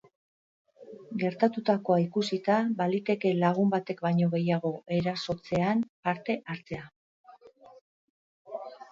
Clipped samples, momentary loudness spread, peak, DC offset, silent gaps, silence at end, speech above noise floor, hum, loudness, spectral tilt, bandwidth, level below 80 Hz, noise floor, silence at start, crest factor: under 0.1%; 14 LU; -10 dBFS; under 0.1%; 5.89-6.03 s, 6.96-7.24 s, 7.81-8.45 s; 0.05 s; 26 dB; none; -28 LUFS; -7.5 dB/octave; 7.6 kHz; -66 dBFS; -54 dBFS; 0.8 s; 20 dB